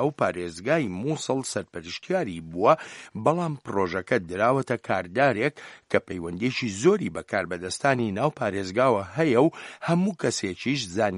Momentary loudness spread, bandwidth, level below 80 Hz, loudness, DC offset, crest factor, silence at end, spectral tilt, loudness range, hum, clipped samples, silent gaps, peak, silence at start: 7 LU; 11.5 kHz; -62 dBFS; -26 LUFS; under 0.1%; 20 dB; 0 s; -5.5 dB/octave; 2 LU; none; under 0.1%; none; -4 dBFS; 0 s